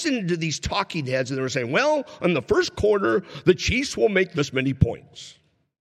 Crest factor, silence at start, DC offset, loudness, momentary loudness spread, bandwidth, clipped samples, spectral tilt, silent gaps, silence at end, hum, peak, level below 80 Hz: 20 dB; 0 s; under 0.1%; -23 LUFS; 5 LU; 12.5 kHz; under 0.1%; -5 dB/octave; none; 0.65 s; none; -4 dBFS; -44 dBFS